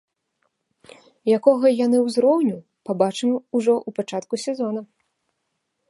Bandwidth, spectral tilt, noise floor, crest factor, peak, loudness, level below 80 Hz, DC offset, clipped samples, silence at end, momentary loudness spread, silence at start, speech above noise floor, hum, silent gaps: 11.5 kHz; -6 dB/octave; -76 dBFS; 20 dB; -2 dBFS; -21 LUFS; -76 dBFS; under 0.1%; under 0.1%; 1.05 s; 11 LU; 1.25 s; 56 dB; none; none